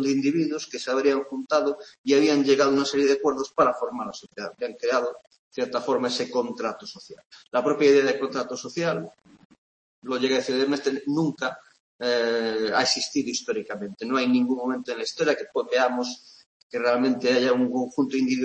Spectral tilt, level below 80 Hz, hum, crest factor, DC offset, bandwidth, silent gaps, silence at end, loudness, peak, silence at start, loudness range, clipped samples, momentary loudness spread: -4 dB/octave; -70 dBFS; none; 18 dB; under 0.1%; 8.8 kHz; 1.98-2.04 s, 5.39-5.51 s, 7.25-7.30 s, 9.45-9.50 s, 9.58-10.02 s, 11.80-11.99 s, 16.46-16.70 s; 0 s; -24 LUFS; -6 dBFS; 0 s; 5 LU; under 0.1%; 12 LU